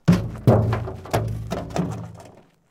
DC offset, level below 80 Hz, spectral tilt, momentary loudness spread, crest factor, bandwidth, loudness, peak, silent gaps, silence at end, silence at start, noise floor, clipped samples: under 0.1%; -40 dBFS; -7.5 dB/octave; 11 LU; 20 dB; 15.5 kHz; -23 LUFS; -2 dBFS; none; 0.4 s; 0.05 s; -48 dBFS; under 0.1%